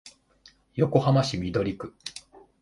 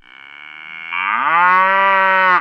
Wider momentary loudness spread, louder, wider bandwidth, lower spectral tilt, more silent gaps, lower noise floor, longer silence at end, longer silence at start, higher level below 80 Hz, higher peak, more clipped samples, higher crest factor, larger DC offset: about the same, 18 LU vs 20 LU; second, -25 LUFS vs -13 LUFS; first, 11.5 kHz vs 6.2 kHz; first, -6.5 dB/octave vs -4.5 dB/octave; neither; first, -59 dBFS vs -38 dBFS; first, 0.45 s vs 0 s; second, 0.05 s vs 0.35 s; first, -52 dBFS vs -76 dBFS; second, -6 dBFS vs 0 dBFS; neither; first, 22 dB vs 16 dB; neither